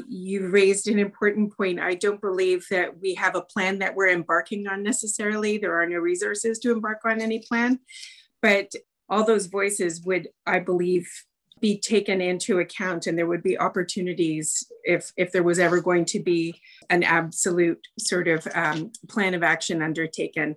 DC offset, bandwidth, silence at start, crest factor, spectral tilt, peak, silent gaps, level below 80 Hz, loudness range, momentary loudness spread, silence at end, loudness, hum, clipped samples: under 0.1%; 12.5 kHz; 0 s; 16 dB; -4 dB/octave; -8 dBFS; none; -72 dBFS; 2 LU; 7 LU; 0 s; -24 LUFS; none; under 0.1%